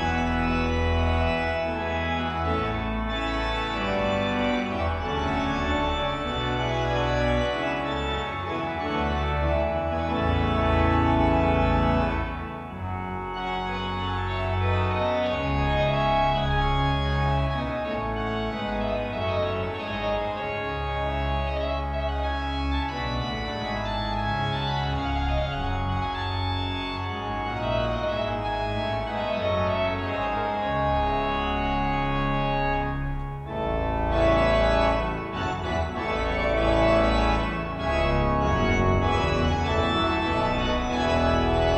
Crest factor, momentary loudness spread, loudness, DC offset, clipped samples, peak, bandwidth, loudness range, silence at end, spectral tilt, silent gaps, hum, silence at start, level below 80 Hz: 16 dB; 7 LU; -26 LUFS; under 0.1%; under 0.1%; -10 dBFS; 8.4 kHz; 4 LU; 0 s; -6.5 dB/octave; none; none; 0 s; -32 dBFS